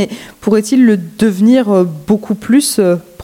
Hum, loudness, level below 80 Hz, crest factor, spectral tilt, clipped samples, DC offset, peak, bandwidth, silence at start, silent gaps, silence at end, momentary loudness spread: none; -12 LUFS; -50 dBFS; 12 dB; -5.5 dB/octave; under 0.1%; under 0.1%; 0 dBFS; 16.5 kHz; 0 s; none; 0 s; 6 LU